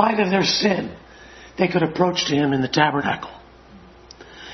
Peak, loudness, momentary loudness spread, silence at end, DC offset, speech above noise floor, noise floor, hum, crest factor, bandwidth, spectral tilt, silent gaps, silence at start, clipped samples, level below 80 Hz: 0 dBFS; -20 LUFS; 16 LU; 0 s; under 0.1%; 26 dB; -46 dBFS; none; 20 dB; 6.4 kHz; -4.5 dB/octave; none; 0 s; under 0.1%; -52 dBFS